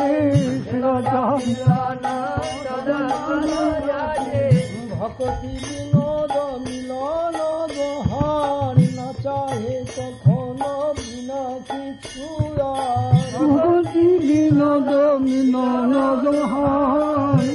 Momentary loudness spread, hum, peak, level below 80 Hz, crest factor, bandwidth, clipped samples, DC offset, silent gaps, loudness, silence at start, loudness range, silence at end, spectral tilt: 11 LU; none; -4 dBFS; -44 dBFS; 16 dB; 11.5 kHz; under 0.1%; under 0.1%; none; -20 LUFS; 0 s; 6 LU; 0 s; -7.5 dB/octave